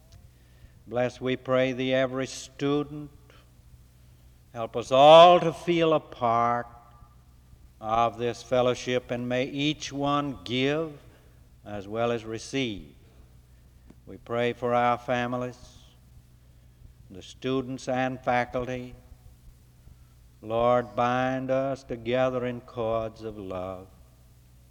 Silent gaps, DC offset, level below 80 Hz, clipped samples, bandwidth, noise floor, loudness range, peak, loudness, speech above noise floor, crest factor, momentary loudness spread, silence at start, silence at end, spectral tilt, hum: none; under 0.1%; -54 dBFS; under 0.1%; 12 kHz; -55 dBFS; 11 LU; -4 dBFS; -26 LUFS; 29 dB; 22 dB; 14 LU; 0.15 s; 0.85 s; -5.5 dB/octave; none